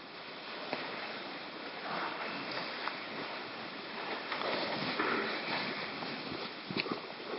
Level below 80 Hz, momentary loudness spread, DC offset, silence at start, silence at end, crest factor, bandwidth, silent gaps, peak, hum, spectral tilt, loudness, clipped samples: -78 dBFS; 8 LU; under 0.1%; 0 s; 0 s; 24 dB; 5.8 kHz; none; -14 dBFS; none; -1 dB/octave; -38 LUFS; under 0.1%